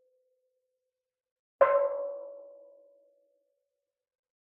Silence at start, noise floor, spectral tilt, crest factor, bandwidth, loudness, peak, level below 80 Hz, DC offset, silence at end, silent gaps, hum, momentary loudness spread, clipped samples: 1.6 s; -89 dBFS; -1.5 dB/octave; 26 dB; 3.4 kHz; -28 LUFS; -8 dBFS; -86 dBFS; under 0.1%; 2 s; none; none; 22 LU; under 0.1%